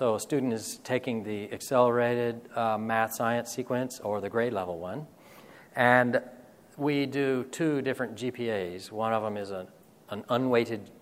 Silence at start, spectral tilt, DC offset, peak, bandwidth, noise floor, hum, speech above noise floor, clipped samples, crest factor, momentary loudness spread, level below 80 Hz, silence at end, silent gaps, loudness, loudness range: 0 s; -5 dB/octave; under 0.1%; -6 dBFS; 16 kHz; -52 dBFS; none; 23 dB; under 0.1%; 24 dB; 13 LU; -72 dBFS; 0.1 s; none; -29 LUFS; 3 LU